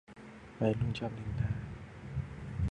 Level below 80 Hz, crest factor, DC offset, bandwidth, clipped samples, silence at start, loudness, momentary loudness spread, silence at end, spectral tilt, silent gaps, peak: -46 dBFS; 22 dB; under 0.1%; 9.4 kHz; under 0.1%; 0.1 s; -37 LUFS; 17 LU; 0.05 s; -8 dB/octave; none; -16 dBFS